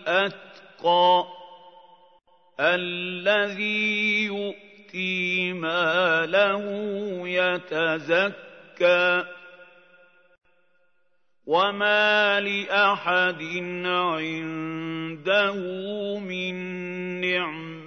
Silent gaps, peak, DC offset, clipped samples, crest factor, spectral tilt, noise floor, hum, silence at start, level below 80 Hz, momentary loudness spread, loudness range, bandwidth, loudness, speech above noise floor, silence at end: none; -6 dBFS; under 0.1%; under 0.1%; 18 dB; -5 dB/octave; -74 dBFS; none; 0 s; -80 dBFS; 11 LU; 4 LU; 6.6 kHz; -24 LUFS; 50 dB; 0 s